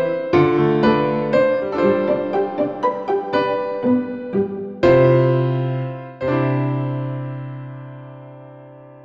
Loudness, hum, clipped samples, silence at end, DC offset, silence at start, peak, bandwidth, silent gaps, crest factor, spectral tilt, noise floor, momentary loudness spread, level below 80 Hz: -19 LUFS; none; under 0.1%; 0 s; 0.2%; 0 s; -4 dBFS; 7 kHz; none; 16 dB; -9.5 dB/octave; -41 dBFS; 16 LU; -52 dBFS